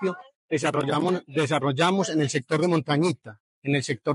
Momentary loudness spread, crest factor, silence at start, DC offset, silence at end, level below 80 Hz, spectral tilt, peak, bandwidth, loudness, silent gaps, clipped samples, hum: 8 LU; 14 dB; 0 s; under 0.1%; 0 s; -74 dBFS; -5.5 dB/octave; -10 dBFS; 11.5 kHz; -25 LUFS; 0.35-0.49 s, 3.40-3.62 s; under 0.1%; none